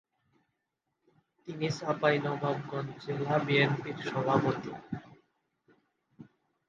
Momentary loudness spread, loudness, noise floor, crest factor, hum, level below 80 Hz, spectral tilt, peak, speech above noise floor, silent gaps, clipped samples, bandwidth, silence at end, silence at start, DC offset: 15 LU; -31 LUFS; -84 dBFS; 22 dB; none; -70 dBFS; -6.5 dB/octave; -10 dBFS; 53 dB; none; under 0.1%; 7.6 kHz; 0.45 s; 1.45 s; under 0.1%